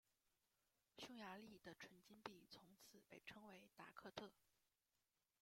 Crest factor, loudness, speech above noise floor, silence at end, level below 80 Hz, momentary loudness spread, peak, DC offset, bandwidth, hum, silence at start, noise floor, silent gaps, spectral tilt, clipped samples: 28 dB; -61 LUFS; over 28 dB; 0.9 s; under -90 dBFS; 8 LU; -36 dBFS; under 0.1%; 16.5 kHz; none; 0.95 s; under -90 dBFS; none; -3.5 dB/octave; under 0.1%